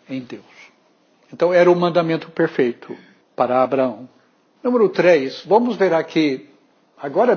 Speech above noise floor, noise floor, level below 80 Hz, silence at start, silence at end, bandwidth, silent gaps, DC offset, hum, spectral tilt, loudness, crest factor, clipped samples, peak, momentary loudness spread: 40 dB; -58 dBFS; -72 dBFS; 0.1 s; 0 s; 6.8 kHz; none; under 0.1%; none; -7 dB/octave; -18 LUFS; 16 dB; under 0.1%; -2 dBFS; 22 LU